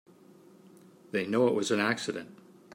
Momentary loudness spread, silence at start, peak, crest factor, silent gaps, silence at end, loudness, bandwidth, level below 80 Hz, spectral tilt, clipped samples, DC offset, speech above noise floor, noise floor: 13 LU; 1.15 s; -12 dBFS; 20 dB; none; 0.4 s; -29 LUFS; 16 kHz; -80 dBFS; -4.5 dB/octave; under 0.1%; under 0.1%; 28 dB; -56 dBFS